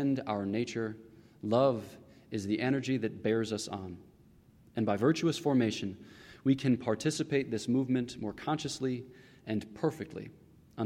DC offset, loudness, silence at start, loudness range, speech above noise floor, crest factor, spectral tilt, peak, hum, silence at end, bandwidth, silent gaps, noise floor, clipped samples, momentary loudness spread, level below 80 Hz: under 0.1%; -33 LUFS; 0 s; 4 LU; 29 dB; 18 dB; -6 dB/octave; -14 dBFS; none; 0 s; 14.5 kHz; none; -60 dBFS; under 0.1%; 18 LU; -68 dBFS